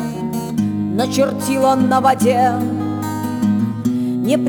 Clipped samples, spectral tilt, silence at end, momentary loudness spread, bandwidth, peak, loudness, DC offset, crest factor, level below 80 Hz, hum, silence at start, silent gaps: under 0.1%; -6 dB/octave; 0 s; 8 LU; over 20 kHz; -2 dBFS; -17 LUFS; under 0.1%; 14 dB; -54 dBFS; none; 0 s; none